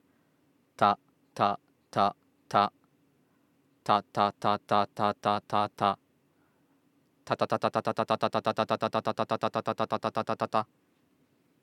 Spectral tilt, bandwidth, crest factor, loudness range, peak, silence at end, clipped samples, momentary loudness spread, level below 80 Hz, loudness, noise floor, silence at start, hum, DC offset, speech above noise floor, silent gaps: -6 dB/octave; 14 kHz; 22 dB; 2 LU; -8 dBFS; 1 s; under 0.1%; 5 LU; -80 dBFS; -30 LUFS; -69 dBFS; 0.8 s; none; under 0.1%; 40 dB; none